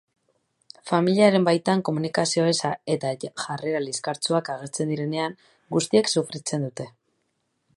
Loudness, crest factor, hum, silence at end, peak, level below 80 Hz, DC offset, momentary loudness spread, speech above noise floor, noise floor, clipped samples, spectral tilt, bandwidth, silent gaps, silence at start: -24 LUFS; 20 dB; none; 0.85 s; -4 dBFS; -72 dBFS; under 0.1%; 13 LU; 50 dB; -74 dBFS; under 0.1%; -4.5 dB/octave; 11.5 kHz; none; 0.85 s